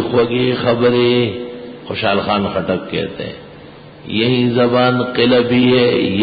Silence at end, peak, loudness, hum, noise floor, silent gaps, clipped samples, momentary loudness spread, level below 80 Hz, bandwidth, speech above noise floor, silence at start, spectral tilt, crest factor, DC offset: 0 s; -2 dBFS; -15 LUFS; none; -37 dBFS; none; under 0.1%; 15 LU; -46 dBFS; 5 kHz; 23 dB; 0 s; -11.5 dB/octave; 14 dB; under 0.1%